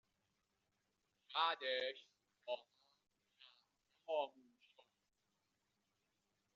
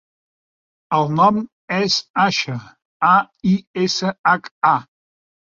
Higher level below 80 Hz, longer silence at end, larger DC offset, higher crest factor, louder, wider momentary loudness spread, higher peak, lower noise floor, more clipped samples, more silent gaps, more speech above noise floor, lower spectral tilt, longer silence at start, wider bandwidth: second, under -90 dBFS vs -60 dBFS; first, 2.25 s vs 0.75 s; neither; first, 24 dB vs 18 dB; second, -43 LUFS vs -18 LUFS; first, 20 LU vs 7 LU; second, -24 dBFS vs -2 dBFS; about the same, -87 dBFS vs under -90 dBFS; neither; second, none vs 1.52-1.68 s, 2.10-2.14 s, 2.85-3.00 s, 3.67-3.74 s, 4.19-4.24 s, 4.51-4.61 s; second, 44 dB vs over 72 dB; second, 3.5 dB/octave vs -4.5 dB/octave; first, 1.3 s vs 0.9 s; about the same, 7.4 kHz vs 7.6 kHz